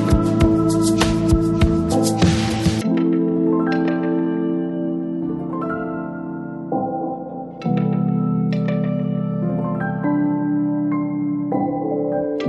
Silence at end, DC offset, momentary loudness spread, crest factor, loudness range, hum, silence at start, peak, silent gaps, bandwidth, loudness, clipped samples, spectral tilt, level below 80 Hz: 0 s; under 0.1%; 8 LU; 16 dB; 6 LU; none; 0 s; -2 dBFS; none; 12 kHz; -20 LUFS; under 0.1%; -6.5 dB/octave; -34 dBFS